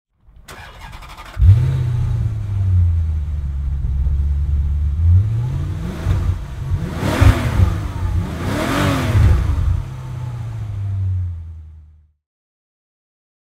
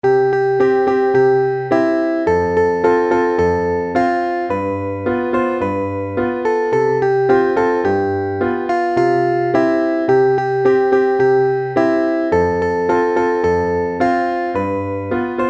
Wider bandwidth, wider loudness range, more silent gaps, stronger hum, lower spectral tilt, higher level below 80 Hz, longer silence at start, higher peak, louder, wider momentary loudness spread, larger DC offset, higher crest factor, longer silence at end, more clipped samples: first, 14 kHz vs 7.6 kHz; first, 7 LU vs 3 LU; neither; neither; about the same, -7 dB/octave vs -7.5 dB/octave; first, -22 dBFS vs -46 dBFS; first, 0.5 s vs 0.05 s; about the same, 0 dBFS vs -2 dBFS; second, -19 LUFS vs -16 LUFS; first, 17 LU vs 6 LU; neither; about the same, 18 dB vs 14 dB; first, 1.6 s vs 0 s; neither